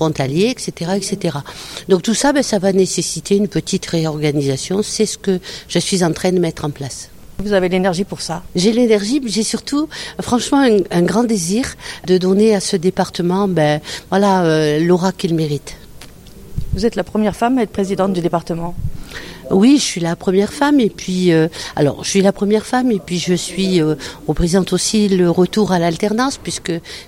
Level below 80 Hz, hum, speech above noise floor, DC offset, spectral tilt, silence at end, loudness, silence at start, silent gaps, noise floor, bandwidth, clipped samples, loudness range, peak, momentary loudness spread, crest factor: -38 dBFS; none; 21 dB; under 0.1%; -5 dB/octave; 0.05 s; -16 LUFS; 0 s; none; -37 dBFS; 16 kHz; under 0.1%; 3 LU; -2 dBFS; 10 LU; 14 dB